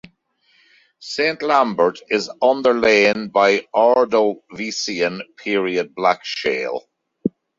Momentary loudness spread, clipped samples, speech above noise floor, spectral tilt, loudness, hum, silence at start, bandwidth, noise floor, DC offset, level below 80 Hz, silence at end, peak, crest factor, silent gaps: 12 LU; under 0.1%; 43 dB; -4 dB/octave; -18 LUFS; none; 1 s; 7.8 kHz; -61 dBFS; under 0.1%; -60 dBFS; 0.3 s; -2 dBFS; 18 dB; none